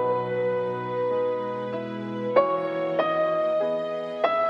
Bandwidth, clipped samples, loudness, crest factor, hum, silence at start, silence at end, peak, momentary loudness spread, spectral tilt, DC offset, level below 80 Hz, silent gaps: 6.6 kHz; under 0.1%; -26 LUFS; 20 dB; none; 0 s; 0 s; -6 dBFS; 8 LU; -7.5 dB/octave; under 0.1%; -72 dBFS; none